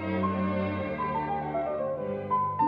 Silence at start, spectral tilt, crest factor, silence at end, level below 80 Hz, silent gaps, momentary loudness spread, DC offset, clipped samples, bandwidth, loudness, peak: 0 s; -10 dB/octave; 14 dB; 0 s; -56 dBFS; none; 3 LU; under 0.1%; under 0.1%; 5.2 kHz; -30 LUFS; -16 dBFS